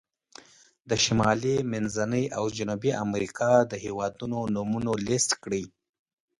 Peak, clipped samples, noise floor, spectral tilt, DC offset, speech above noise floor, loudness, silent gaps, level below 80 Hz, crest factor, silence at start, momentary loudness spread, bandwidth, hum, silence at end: -8 dBFS; under 0.1%; -55 dBFS; -4.5 dB/octave; under 0.1%; 29 dB; -27 LUFS; none; -56 dBFS; 20 dB; 0.85 s; 9 LU; 11.5 kHz; none; 0.7 s